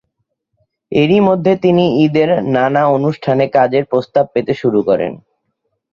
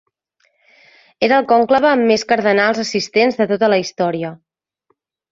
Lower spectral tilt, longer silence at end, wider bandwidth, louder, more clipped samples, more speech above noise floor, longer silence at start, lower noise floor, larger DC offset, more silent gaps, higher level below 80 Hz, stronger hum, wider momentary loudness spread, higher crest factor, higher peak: first, -8.5 dB/octave vs -4.5 dB/octave; second, 0.8 s vs 0.95 s; second, 7 kHz vs 7.8 kHz; about the same, -14 LUFS vs -15 LUFS; neither; first, 58 dB vs 51 dB; second, 0.9 s vs 1.2 s; first, -70 dBFS vs -66 dBFS; neither; neither; first, -54 dBFS vs -60 dBFS; neither; about the same, 5 LU vs 7 LU; about the same, 14 dB vs 16 dB; about the same, -2 dBFS vs -2 dBFS